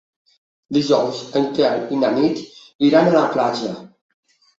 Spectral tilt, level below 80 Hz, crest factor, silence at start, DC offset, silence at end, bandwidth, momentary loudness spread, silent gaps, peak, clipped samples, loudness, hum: -6 dB/octave; -62 dBFS; 18 dB; 0.7 s; under 0.1%; 0.75 s; 7.8 kHz; 13 LU; 2.75-2.79 s; -2 dBFS; under 0.1%; -18 LUFS; none